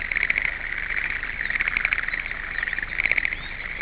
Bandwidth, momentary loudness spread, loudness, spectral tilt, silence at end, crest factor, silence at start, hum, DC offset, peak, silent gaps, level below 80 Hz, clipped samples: 4 kHz; 7 LU; -24 LUFS; -0.5 dB/octave; 0 s; 22 dB; 0 s; none; under 0.1%; -4 dBFS; none; -40 dBFS; under 0.1%